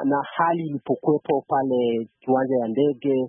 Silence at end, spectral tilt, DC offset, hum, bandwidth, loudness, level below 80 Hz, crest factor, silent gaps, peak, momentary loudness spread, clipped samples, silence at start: 0 s; -11.5 dB/octave; under 0.1%; none; 3.7 kHz; -23 LUFS; -72 dBFS; 14 dB; none; -8 dBFS; 4 LU; under 0.1%; 0 s